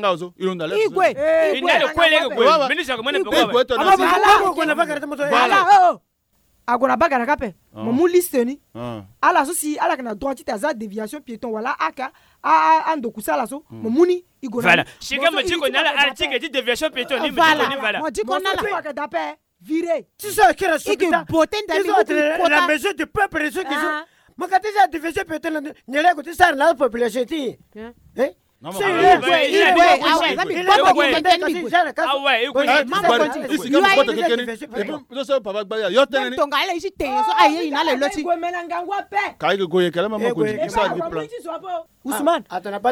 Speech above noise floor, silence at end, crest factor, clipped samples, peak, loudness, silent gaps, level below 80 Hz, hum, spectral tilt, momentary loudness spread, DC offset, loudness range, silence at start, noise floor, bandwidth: 45 dB; 0 s; 18 dB; under 0.1%; -2 dBFS; -18 LUFS; none; -52 dBFS; none; -3.5 dB/octave; 13 LU; under 0.1%; 6 LU; 0 s; -64 dBFS; 18 kHz